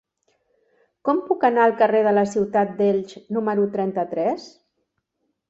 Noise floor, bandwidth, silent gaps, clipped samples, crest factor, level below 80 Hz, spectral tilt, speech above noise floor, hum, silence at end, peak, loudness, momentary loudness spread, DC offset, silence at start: -75 dBFS; 8 kHz; none; under 0.1%; 18 dB; -66 dBFS; -7 dB/octave; 55 dB; none; 1 s; -4 dBFS; -21 LUFS; 9 LU; under 0.1%; 1.05 s